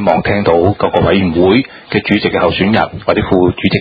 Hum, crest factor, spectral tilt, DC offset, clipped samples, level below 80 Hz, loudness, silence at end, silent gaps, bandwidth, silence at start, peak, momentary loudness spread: none; 12 dB; -9 dB/octave; under 0.1%; 0.2%; -32 dBFS; -12 LUFS; 0 s; none; 5 kHz; 0 s; 0 dBFS; 4 LU